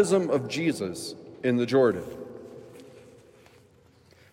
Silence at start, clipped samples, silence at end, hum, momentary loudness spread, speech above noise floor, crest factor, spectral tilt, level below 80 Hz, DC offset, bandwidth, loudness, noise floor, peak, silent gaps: 0 s; under 0.1%; 1.35 s; none; 23 LU; 33 dB; 20 dB; -5.5 dB/octave; -70 dBFS; under 0.1%; 16 kHz; -26 LUFS; -58 dBFS; -10 dBFS; none